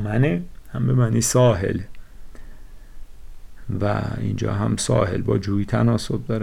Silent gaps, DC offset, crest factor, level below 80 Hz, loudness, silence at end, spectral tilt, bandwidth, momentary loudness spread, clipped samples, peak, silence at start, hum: none; under 0.1%; 14 dB; -40 dBFS; -21 LUFS; 0 s; -6 dB/octave; 15.5 kHz; 12 LU; under 0.1%; -8 dBFS; 0 s; none